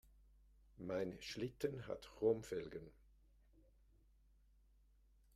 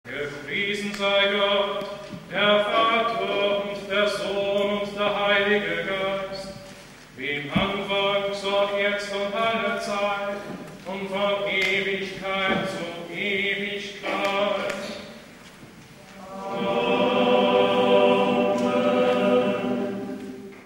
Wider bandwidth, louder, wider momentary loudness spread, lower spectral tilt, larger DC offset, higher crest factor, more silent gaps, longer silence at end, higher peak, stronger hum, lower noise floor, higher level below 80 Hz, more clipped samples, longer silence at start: about the same, 15 kHz vs 16 kHz; second, -44 LUFS vs -23 LUFS; about the same, 15 LU vs 15 LU; first, -6 dB/octave vs -4.5 dB/octave; neither; about the same, 22 dB vs 18 dB; neither; first, 2.45 s vs 0 s; second, -26 dBFS vs -6 dBFS; neither; first, -72 dBFS vs -46 dBFS; second, -68 dBFS vs -56 dBFS; neither; first, 0.75 s vs 0.05 s